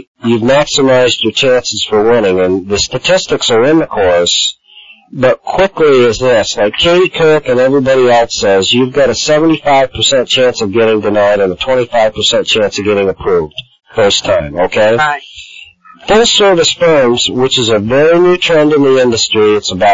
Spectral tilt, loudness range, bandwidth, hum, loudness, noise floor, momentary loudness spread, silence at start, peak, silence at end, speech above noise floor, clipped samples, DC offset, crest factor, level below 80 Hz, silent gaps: -3.5 dB/octave; 3 LU; 7.8 kHz; none; -9 LUFS; -39 dBFS; 5 LU; 0.25 s; 0 dBFS; 0 s; 29 dB; under 0.1%; 0.7%; 10 dB; -38 dBFS; none